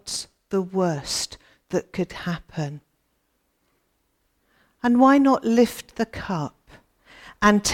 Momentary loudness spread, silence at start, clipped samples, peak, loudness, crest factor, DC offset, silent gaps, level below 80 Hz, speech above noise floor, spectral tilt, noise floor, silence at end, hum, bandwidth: 15 LU; 0.05 s; under 0.1%; -2 dBFS; -23 LUFS; 22 dB; under 0.1%; none; -52 dBFS; 49 dB; -4.5 dB/octave; -71 dBFS; 0 s; none; 17 kHz